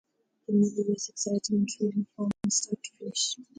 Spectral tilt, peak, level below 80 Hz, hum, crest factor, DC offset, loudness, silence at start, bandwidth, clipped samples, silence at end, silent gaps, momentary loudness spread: -4.5 dB/octave; -14 dBFS; -70 dBFS; none; 16 dB; under 0.1%; -29 LUFS; 0.5 s; 9.6 kHz; under 0.1%; 0.15 s; none; 8 LU